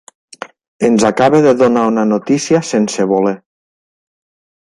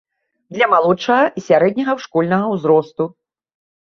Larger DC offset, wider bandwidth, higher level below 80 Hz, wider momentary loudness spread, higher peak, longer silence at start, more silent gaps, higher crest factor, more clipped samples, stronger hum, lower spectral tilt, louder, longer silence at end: neither; first, 11.5 kHz vs 7 kHz; first, -56 dBFS vs -64 dBFS; first, 21 LU vs 10 LU; about the same, 0 dBFS vs -2 dBFS; about the same, 0.4 s vs 0.5 s; first, 0.68-0.79 s vs none; about the same, 14 dB vs 16 dB; neither; neither; about the same, -5.5 dB/octave vs -6.5 dB/octave; first, -13 LUFS vs -16 LUFS; first, 1.3 s vs 0.85 s